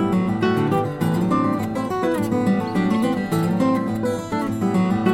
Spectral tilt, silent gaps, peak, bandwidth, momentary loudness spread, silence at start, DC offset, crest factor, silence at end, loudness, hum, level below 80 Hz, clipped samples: -7.5 dB/octave; none; -6 dBFS; 16 kHz; 4 LU; 0 s; under 0.1%; 14 dB; 0 s; -21 LUFS; none; -50 dBFS; under 0.1%